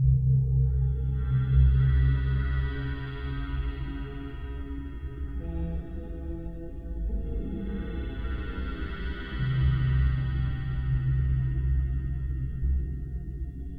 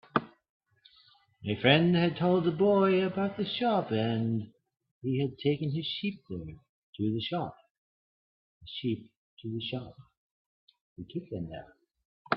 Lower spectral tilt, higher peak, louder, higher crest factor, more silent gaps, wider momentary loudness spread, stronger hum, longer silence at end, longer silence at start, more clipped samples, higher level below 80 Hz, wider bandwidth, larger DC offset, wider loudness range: about the same, -10 dB/octave vs -10 dB/octave; about the same, -10 dBFS vs -8 dBFS; about the same, -30 LUFS vs -30 LUFS; second, 16 dB vs 24 dB; second, none vs 0.49-0.60 s, 4.91-5.01 s, 6.69-6.93 s, 7.71-8.61 s, 9.17-9.37 s, 10.17-10.67 s, 10.81-10.96 s, 12.05-12.25 s; second, 14 LU vs 17 LU; neither; about the same, 0 s vs 0 s; second, 0 s vs 0.15 s; neither; first, -30 dBFS vs -66 dBFS; second, 4.5 kHz vs 5.6 kHz; neither; second, 10 LU vs 14 LU